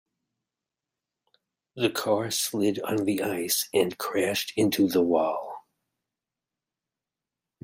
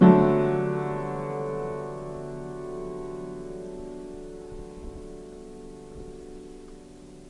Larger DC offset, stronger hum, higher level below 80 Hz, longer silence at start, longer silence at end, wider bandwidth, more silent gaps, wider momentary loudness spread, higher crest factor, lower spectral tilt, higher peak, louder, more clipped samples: neither; neither; second, -72 dBFS vs -48 dBFS; first, 1.75 s vs 0 s; first, 2.05 s vs 0 s; first, 16 kHz vs 11 kHz; neither; second, 6 LU vs 19 LU; about the same, 20 dB vs 24 dB; second, -4 dB/octave vs -9 dB/octave; second, -10 dBFS vs -4 dBFS; about the same, -26 LUFS vs -28 LUFS; neither